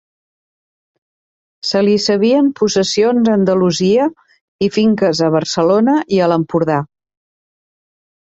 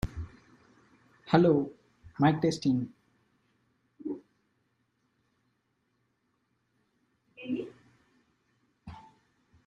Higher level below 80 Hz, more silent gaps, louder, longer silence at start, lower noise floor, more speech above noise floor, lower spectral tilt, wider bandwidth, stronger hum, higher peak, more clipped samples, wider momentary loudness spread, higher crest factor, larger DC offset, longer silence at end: about the same, -56 dBFS vs -56 dBFS; first, 4.41-4.59 s vs none; first, -14 LUFS vs -29 LUFS; first, 1.65 s vs 0.05 s; first, under -90 dBFS vs -76 dBFS; first, over 77 dB vs 51 dB; second, -5.5 dB/octave vs -7.5 dB/octave; second, 8 kHz vs 11 kHz; neither; first, -2 dBFS vs -6 dBFS; neither; second, 6 LU vs 24 LU; second, 12 dB vs 28 dB; neither; first, 1.45 s vs 0.7 s